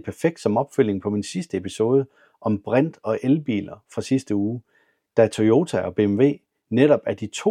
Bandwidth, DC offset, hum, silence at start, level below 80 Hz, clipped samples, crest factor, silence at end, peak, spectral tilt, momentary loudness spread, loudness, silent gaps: 12.5 kHz; under 0.1%; none; 0.05 s; -64 dBFS; under 0.1%; 18 dB; 0 s; -4 dBFS; -7 dB/octave; 10 LU; -22 LUFS; none